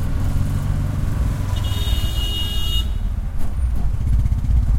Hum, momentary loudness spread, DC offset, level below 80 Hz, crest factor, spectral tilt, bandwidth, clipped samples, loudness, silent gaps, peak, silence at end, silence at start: none; 5 LU; under 0.1%; -20 dBFS; 12 dB; -5.5 dB/octave; 16 kHz; under 0.1%; -23 LUFS; none; -6 dBFS; 0 s; 0 s